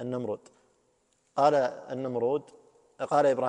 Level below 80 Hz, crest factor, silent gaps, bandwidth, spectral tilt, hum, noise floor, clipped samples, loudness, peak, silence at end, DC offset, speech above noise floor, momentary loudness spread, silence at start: -74 dBFS; 18 dB; none; 9.8 kHz; -6 dB/octave; none; -71 dBFS; under 0.1%; -29 LUFS; -10 dBFS; 0 s; under 0.1%; 43 dB; 13 LU; 0 s